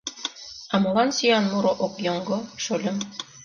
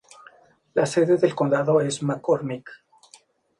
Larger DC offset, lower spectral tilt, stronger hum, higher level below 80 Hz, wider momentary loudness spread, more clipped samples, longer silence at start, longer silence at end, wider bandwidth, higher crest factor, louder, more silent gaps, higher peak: neither; second, -4 dB/octave vs -6 dB/octave; neither; first, -64 dBFS vs -70 dBFS; first, 12 LU vs 8 LU; neither; second, 0.05 s vs 0.75 s; second, 0 s vs 0.85 s; second, 7.4 kHz vs 11.5 kHz; about the same, 18 dB vs 18 dB; about the same, -24 LUFS vs -22 LUFS; neither; about the same, -8 dBFS vs -6 dBFS